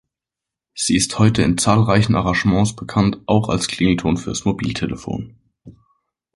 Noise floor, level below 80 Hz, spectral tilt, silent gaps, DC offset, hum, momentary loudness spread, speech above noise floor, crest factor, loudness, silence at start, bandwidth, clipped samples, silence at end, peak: -86 dBFS; -40 dBFS; -5 dB/octave; none; under 0.1%; none; 10 LU; 69 dB; 18 dB; -18 LUFS; 0.75 s; 11.5 kHz; under 0.1%; 0.65 s; 0 dBFS